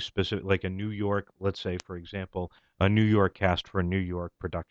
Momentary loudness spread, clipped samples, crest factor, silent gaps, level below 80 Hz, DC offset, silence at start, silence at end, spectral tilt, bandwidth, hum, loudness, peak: 12 LU; under 0.1%; 18 dB; none; -50 dBFS; under 0.1%; 0 s; 0.05 s; -7 dB/octave; 7.8 kHz; none; -29 LUFS; -10 dBFS